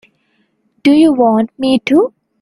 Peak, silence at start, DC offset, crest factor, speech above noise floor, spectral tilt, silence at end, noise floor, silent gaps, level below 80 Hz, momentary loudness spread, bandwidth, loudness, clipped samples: 0 dBFS; 0.85 s; under 0.1%; 12 dB; 50 dB; -6 dB/octave; 0.35 s; -61 dBFS; none; -54 dBFS; 6 LU; 11.5 kHz; -12 LUFS; under 0.1%